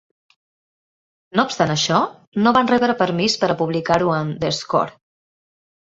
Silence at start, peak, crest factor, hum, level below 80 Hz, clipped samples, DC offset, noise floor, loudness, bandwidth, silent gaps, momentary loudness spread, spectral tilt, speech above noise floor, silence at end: 1.35 s; -2 dBFS; 20 dB; none; -54 dBFS; under 0.1%; under 0.1%; under -90 dBFS; -19 LUFS; 8 kHz; 2.27-2.32 s; 6 LU; -4.5 dB/octave; over 72 dB; 1.05 s